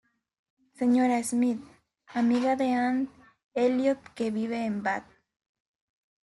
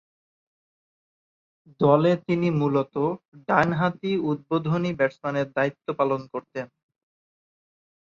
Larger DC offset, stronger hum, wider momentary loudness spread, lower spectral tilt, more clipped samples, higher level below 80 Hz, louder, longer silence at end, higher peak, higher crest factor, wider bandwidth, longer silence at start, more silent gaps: neither; neither; about the same, 11 LU vs 13 LU; second, -5 dB/octave vs -8 dB/octave; neither; second, -70 dBFS vs -64 dBFS; second, -28 LUFS vs -24 LUFS; second, 1.2 s vs 1.55 s; second, -14 dBFS vs -4 dBFS; second, 16 dB vs 22 dB; first, 12 kHz vs 7.2 kHz; second, 0.8 s vs 1.8 s; about the same, 3.44-3.49 s vs 3.28-3.32 s